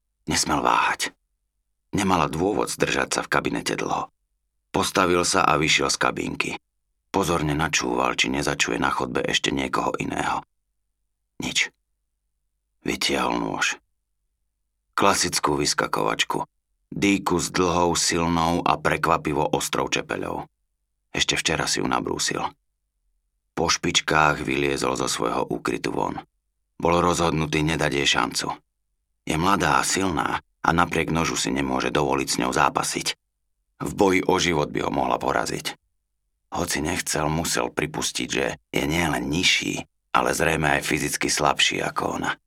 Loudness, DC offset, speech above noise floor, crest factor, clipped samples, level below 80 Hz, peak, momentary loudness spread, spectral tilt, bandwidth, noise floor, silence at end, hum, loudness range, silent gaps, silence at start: -23 LUFS; under 0.1%; 52 dB; 22 dB; under 0.1%; -46 dBFS; -2 dBFS; 9 LU; -3 dB/octave; 17 kHz; -76 dBFS; 0.1 s; 50 Hz at -55 dBFS; 4 LU; none; 0.25 s